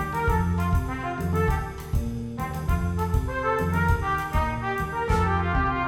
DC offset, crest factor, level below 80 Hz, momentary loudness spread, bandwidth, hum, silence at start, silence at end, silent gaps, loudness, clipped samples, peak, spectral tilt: under 0.1%; 16 dB; -30 dBFS; 6 LU; 16.5 kHz; none; 0 s; 0 s; none; -26 LUFS; under 0.1%; -10 dBFS; -7 dB/octave